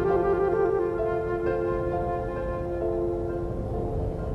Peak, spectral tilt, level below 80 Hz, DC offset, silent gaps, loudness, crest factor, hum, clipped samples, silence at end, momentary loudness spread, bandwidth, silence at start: -12 dBFS; -9.5 dB/octave; -38 dBFS; under 0.1%; none; -27 LUFS; 14 dB; none; under 0.1%; 0 s; 7 LU; 6 kHz; 0 s